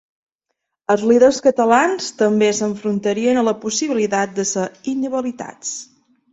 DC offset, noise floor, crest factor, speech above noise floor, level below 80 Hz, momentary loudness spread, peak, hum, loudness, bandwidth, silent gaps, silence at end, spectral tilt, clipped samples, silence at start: under 0.1%; -77 dBFS; 18 dB; 60 dB; -60 dBFS; 14 LU; -2 dBFS; none; -18 LUFS; 8.2 kHz; none; 0.5 s; -4 dB/octave; under 0.1%; 0.9 s